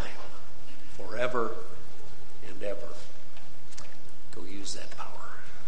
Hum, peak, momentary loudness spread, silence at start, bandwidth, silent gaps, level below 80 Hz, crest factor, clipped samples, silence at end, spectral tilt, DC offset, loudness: none; -10 dBFS; 19 LU; 0 s; 10 kHz; none; -58 dBFS; 26 dB; under 0.1%; 0 s; -4.5 dB/octave; 10%; -38 LUFS